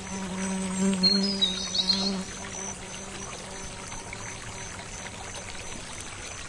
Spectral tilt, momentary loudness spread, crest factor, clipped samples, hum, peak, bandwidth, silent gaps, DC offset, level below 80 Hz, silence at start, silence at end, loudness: -3 dB/octave; 15 LU; 20 dB; under 0.1%; none; -12 dBFS; 11.5 kHz; none; under 0.1%; -50 dBFS; 0 s; 0 s; -29 LUFS